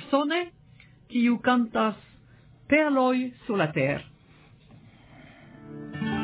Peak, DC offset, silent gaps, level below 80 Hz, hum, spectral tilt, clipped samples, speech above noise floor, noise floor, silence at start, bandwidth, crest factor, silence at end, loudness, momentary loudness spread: -8 dBFS; under 0.1%; none; -60 dBFS; none; -9.5 dB/octave; under 0.1%; 31 dB; -55 dBFS; 0 s; 4 kHz; 20 dB; 0 s; -25 LUFS; 16 LU